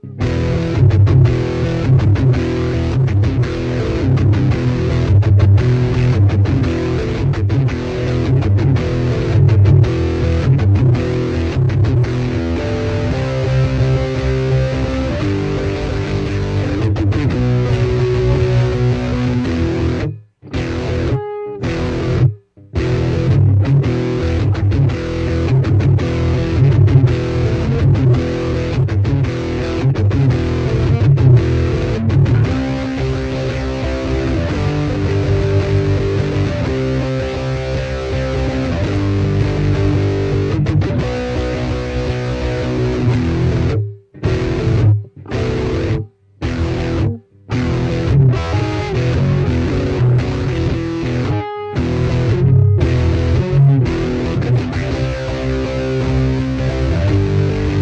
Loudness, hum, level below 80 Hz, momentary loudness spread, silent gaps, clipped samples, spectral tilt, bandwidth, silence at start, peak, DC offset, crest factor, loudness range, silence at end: -16 LUFS; none; -26 dBFS; 7 LU; none; under 0.1%; -8 dB/octave; 8 kHz; 0 s; -2 dBFS; under 0.1%; 14 dB; 4 LU; 0 s